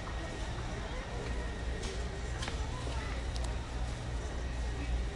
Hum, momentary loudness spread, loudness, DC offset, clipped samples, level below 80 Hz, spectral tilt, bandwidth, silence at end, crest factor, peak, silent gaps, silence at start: none; 2 LU; -39 LUFS; under 0.1%; under 0.1%; -38 dBFS; -5 dB/octave; 11.5 kHz; 0 s; 16 dB; -22 dBFS; none; 0 s